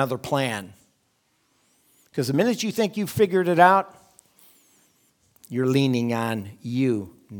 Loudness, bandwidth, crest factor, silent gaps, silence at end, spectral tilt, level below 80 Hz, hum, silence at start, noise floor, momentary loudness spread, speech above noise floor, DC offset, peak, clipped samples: -23 LUFS; 19.5 kHz; 24 dB; none; 0 s; -6 dB/octave; -68 dBFS; none; 0 s; -68 dBFS; 14 LU; 46 dB; under 0.1%; -2 dBFS; under 0.1%